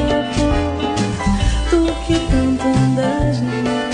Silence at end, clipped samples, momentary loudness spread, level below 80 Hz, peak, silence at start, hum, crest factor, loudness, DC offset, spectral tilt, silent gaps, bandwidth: 0 s; under 0.1%; 4 LU; -24 dBFS; -4 dBFS; 0 s; none; 14 dB; -17 LUFS; under 0.1%; -6 dB/octave; none; 10.5 kHz